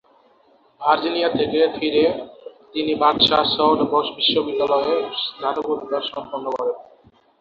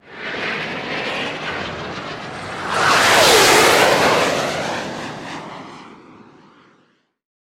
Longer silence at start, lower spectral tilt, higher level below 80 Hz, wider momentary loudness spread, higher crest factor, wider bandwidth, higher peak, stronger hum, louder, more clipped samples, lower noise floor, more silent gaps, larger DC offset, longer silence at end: first, 0.8 s vs 0.05 s; first, -6 dB/octave vs -2 dB/octave; second, -58 dBFS vs -50 dBFS; second, 12 LU vs 19 LU; about the same, 18 dB vs 18 dB; second, 6.8 kHz vs 17 kHz; about the same, -2 dBFS vs 0 dBFS; neither; second, -20 LUFS vs -15 LUFS; neither; second, -56 dBFS vs -60 dBFS; neither; neither; second, 0.6 s vs 1.45 s